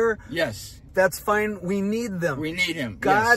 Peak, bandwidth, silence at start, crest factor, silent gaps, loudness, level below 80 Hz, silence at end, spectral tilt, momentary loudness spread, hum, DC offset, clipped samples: -4 dBFS; 16 kHz; 0 s; 18 dB; none; -24 LUFS; -50 dBFS; 0 s; -4.5 dB/octave; 6 LU; none; under 0.1%; under 0.1%